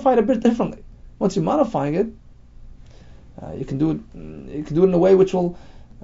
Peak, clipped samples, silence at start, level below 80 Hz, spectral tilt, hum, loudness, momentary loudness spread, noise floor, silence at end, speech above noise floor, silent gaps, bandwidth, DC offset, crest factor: -4 dBFS; under 0.1%; 0 s; -44 dBFS; -8 dB/octave; none; -20 LUFS; 20 LU; -43 dBFS; 0 s; 23 dB; none; 7.8 kHz; under 0.1%; 18 dB